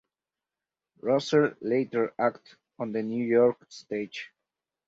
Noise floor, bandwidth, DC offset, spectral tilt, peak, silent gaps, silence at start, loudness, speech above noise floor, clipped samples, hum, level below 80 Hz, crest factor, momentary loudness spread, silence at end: under -90 dBFS; 7.8 kHz; under 0.1%; -6 dB/octave; -10 dBFS; none; 1.05 s; -27 LUFS; over 63 dB; under 0.1%; none; -72 dBFS; 18 dB; 14 LU; 0.6 s